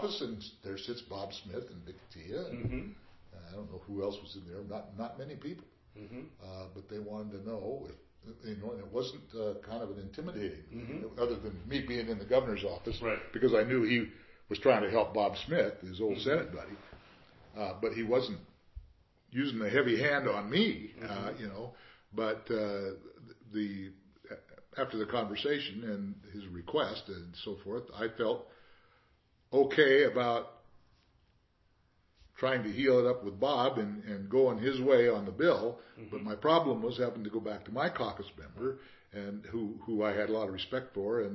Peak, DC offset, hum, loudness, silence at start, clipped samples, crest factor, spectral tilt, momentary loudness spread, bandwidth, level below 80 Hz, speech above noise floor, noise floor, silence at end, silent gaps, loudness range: -10 dBFS; under 0.1%; none; -34 LUFS; 0 s; under 0.1%; 24 dB; -4 dB/octave; 18 LU; 6 kHz; -60 dBFS; 37 dB; -71 dBFS; 0 s; none; 13 LU